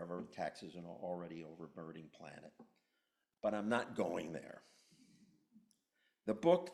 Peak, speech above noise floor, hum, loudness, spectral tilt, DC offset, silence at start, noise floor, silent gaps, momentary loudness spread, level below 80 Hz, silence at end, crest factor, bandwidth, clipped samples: -18 dBFS; 45 dB; none; -42 LUFS; -6 dB/octave; under 0.1%; 0 s; -86 dBFS; none; 19 LU; -80 dBFS; 0 s; 24 dB; 12 kHz; under 0.1%